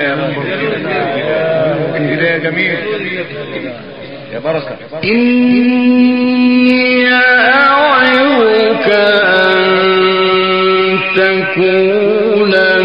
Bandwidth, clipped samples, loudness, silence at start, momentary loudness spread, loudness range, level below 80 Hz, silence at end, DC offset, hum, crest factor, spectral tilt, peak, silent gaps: 5.4 kHz; under 0.1%; -10 LUFS; 0 s; 12 LU; 7 LU; -54 dBFS; 0 s; 0.6%; none; 10 dB; -7.5 dB/octave; 0 dBFS; none